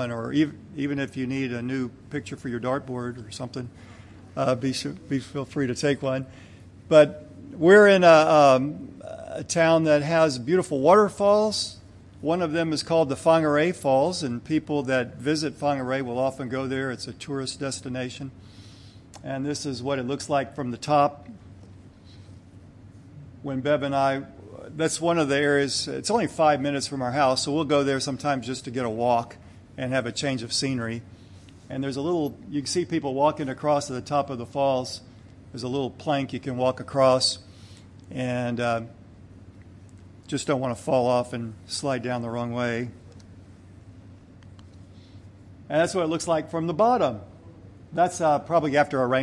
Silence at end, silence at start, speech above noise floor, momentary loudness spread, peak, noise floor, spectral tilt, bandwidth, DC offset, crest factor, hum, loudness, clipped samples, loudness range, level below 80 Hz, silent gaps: 0 s; 0 s; 24 dB; 15 LU; -4 dBFS; -48 dBFS; -5 dB/octave; 12 kHz; under 0.1%; 22 dB; none; -24 LUFS; under 0.1%; 12 LU; -60 dBFS; none